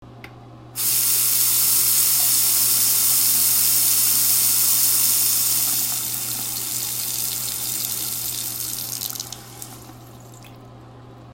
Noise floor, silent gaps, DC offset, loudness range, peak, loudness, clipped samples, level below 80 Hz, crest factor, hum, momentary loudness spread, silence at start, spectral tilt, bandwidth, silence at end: -42 dBFS; none; under 0.1%; 11 LU; -2 dBFS; -17 LUFS; under 0.1%; -56 dBFS; 18 dB; none; 11 LU; 0 s; 0.5 dB/octave; 16.5 kHz; 0 s